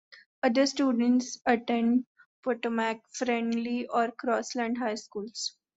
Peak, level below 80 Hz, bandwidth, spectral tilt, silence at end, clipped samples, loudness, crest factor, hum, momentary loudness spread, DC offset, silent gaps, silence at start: -10 dBFS; -74 dBFS; 8 kHz; -3.5 dB/octave; 0.25 s; under 0.1%; -29 LUFS; 18 dB; none; 9 LU; under 0.1%; 0.26-0.42 s, 2.06-2.15 s, 2.26-2.43 s; 0.1 s